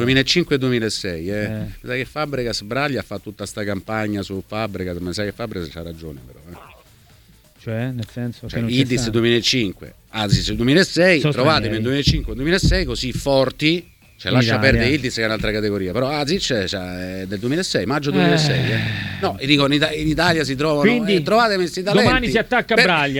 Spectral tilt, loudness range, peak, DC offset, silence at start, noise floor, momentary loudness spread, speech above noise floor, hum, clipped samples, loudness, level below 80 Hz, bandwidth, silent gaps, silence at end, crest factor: -5 dB/octave; 10 LU; 0 dBFS; under 0.1%; 0 s; -50 dBFS; 12 LU; 31 dB; none; under 0.1%; -19 LUFS; -36 dBFS; 19 kHz; none; 0 s; 20 dB